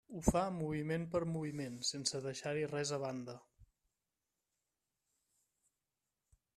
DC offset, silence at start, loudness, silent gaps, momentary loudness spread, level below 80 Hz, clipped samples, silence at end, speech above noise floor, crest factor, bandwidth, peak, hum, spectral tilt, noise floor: under 0.1%; 0.1 s; -39 LUFS; none; 8 LU; -58 dBFS; under 0.1%; 2.9 s; over 51 dB; 26 dB; 14 kHz; -14 dBFS; none; -4.5 dB/octave; under -90 dBFS